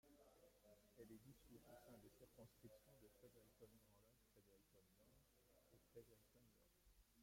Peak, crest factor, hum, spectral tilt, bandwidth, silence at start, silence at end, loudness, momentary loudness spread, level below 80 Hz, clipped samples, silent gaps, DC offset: -52 dBFS; 18 dB; none; -5 dB/octave; 16.5 kHz; 0.05 s; 0 s; -68 LUFS; 3 LU; -82 dBFS; under 0.1%; none; under 0.1%